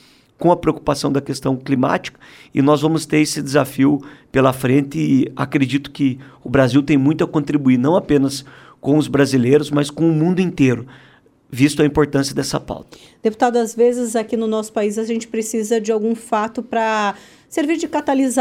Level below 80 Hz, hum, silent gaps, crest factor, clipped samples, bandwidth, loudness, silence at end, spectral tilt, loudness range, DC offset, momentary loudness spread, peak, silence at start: -48 dBFS; none; none; 16 dB; under 0.1%; 16 kHz; -18 LUFS; 0 s; -6 dB/octave; 3 LU; under 0.1%; 8 LU; -2 dBFS; 0.4 s